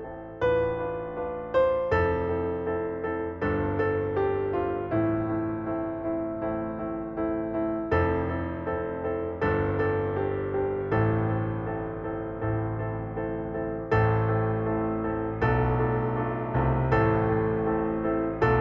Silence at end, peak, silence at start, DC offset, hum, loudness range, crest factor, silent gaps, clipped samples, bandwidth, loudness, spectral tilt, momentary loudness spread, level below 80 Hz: 0 s; -10 dBFS; 0 s; under 0.1%; none; 3 LU; 16 dB; none; under 0.1%; 5.8 kHz; -28 LUFS; -10 dB/octave; 8 LU; -42 dBFS